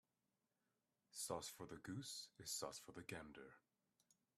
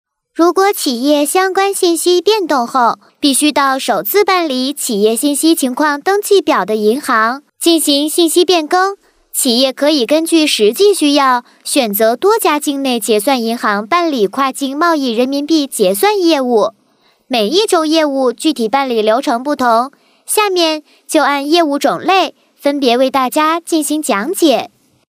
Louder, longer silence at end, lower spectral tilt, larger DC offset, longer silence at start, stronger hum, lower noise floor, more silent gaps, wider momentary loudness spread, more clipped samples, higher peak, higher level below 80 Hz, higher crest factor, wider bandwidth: second, -52 LUFS vs -13 LUFS; first, 0.8 s vs 0.4 s; about the same, -3 dB/octave vs -2.5 dB/octave; neither; first, 1.15 s vs 0.35 s; neither; first, under -90 dBFS vs -55 dBFS; neither; first, 11 LU vs 5 LU; neither; second, -32 dBFS vs -2 dBFS; second, -82 dBFS vs -70 dBFS; first, 24 dB vs 12 dB; about the same, 15.5 kHz vs 16 kHz